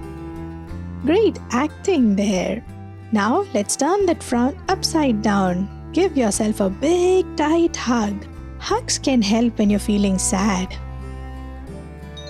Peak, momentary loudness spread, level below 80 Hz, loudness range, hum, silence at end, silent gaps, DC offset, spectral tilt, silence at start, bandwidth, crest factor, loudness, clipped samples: -6 dBFS; 16 LU; -38 dBFS; 1 LU; none; 0 s; none; under 0.1%; -5 dB/octave; 0 s; 13.5 kHz; 14 dB; -20 LUFS; under 0.1%